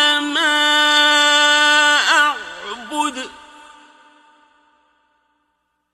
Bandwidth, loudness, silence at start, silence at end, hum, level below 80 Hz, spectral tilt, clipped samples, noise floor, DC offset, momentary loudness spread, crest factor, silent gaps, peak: 15.5 kHz; -13 LUFS; 0 s; 2.6 s; 60 Hz at -80 dBFS; -64 dBFS; 1.5 dB/octave; under 0.1%; -70 dBFS; under 0.1%; 18 LU; 16 dB; none; -2 dBFS